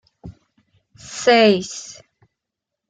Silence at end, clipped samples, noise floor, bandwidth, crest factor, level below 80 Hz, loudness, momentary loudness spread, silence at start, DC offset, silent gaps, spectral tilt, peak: 1 s; under 0.1%; -83 dBFS; 9.4 kHz; 20 dB; -58 dBFS; -16 LUFS; 20 LU; 0.25 s; under 0.1%; none; -3.5 dB/octave; -2 dBFS